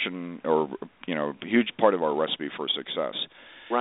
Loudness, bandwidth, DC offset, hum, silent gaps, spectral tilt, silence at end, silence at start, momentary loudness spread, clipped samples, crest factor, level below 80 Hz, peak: -27 LUFS; 4.1 kHz; under 0.1%; none; none; -2 dB/octave; 0 s; 0 s; 11 LU; under 0.1%; 22 dB; -72 dBFS; -6 dBFS